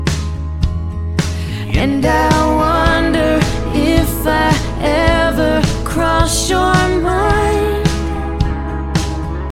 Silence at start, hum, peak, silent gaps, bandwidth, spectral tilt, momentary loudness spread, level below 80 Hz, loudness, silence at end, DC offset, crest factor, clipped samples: 0 s; none; 0 dBFS; none; 16.5 kHz; -5.5 dB/octave; 7 LU; -22 dBFS; -15 LUFS; 0 s; under 0.1%; 14 dB; under 0.1%